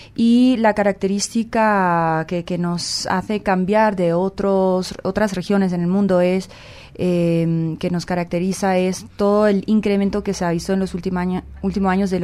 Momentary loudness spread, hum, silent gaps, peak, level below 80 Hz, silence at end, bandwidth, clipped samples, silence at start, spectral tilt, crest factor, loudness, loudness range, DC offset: 7 LU; none; none; -2 dBFS; -44 dBFS; 0 s; 13 kHz; under 0.1%; 0 s; -6 dB/octave; 16 dB; -19 LUFS; 2 LU; under 0.1%